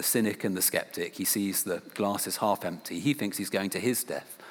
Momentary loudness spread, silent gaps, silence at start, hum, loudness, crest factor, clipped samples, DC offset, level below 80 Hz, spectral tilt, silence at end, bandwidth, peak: 7 LU; none; 0 s; none; -29 LUFS; 20 dB; under 0.1%; under 0.1%; -80 dBFS; -3.5 dB/octave; 0 s; over 20 kHz; -10 dBFS